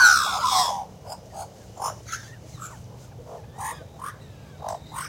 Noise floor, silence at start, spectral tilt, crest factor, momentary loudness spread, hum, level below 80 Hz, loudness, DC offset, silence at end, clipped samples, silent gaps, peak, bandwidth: -43 dBFS; 0 s; -0.5 dB/octave; 22 dB; 22 LU; none; -54 dBFS; -25 LUFS; under 0.1%; 0 s; under 0.1%; none; -4 dBFS; 16.5 kHz